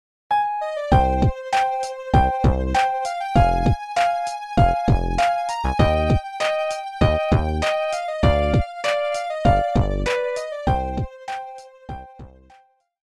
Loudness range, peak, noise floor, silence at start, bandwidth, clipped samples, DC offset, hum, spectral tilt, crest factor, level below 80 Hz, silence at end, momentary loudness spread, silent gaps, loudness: 3 LU; -2 dBFS; -55 dBFS; 0.3 s; 12.5 kHz; under 0.1%; under 0.1%; none; -6.5 dB/octave; 18 dB; -28 dBFS; 0.8 s; 9 LU; none; -21 LUFS